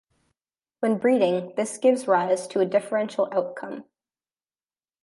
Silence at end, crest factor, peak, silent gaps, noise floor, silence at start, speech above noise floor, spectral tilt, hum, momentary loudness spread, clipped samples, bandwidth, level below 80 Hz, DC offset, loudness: 1.2 s; 18 dB; -8 dBFS; none; under -90 dBFS; 0.8 s; over 67 dB; -5 dB/octave; none; 12 LU; under 0.1%; 11.5 kHz; -78 dBFS; under 0.1%; -24 LUFS